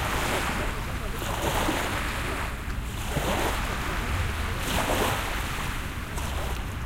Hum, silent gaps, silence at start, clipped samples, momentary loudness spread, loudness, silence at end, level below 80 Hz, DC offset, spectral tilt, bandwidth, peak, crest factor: none; none; 0 s; under 0.1%; 7 LU; -29 LUFS; 0 s; -34 dBFS; under 0.1%; -4 dB/octave; 16.5 kHz; -12 dBFS; 16 dB